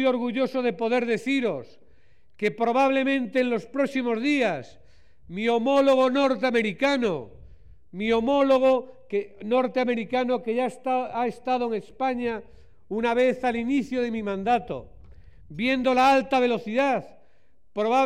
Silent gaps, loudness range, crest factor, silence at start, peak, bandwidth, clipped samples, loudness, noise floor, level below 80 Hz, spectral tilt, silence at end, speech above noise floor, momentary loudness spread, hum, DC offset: none; 3 LU; 14 dB; 0 s; -12 dBFS; 11 kHz; under 0.1%; -24 LUFS; -66 dBFS; -58 dBFS; -5.5 dB/octave; 0 s; 43 dB; 10 LU; none; 0.4%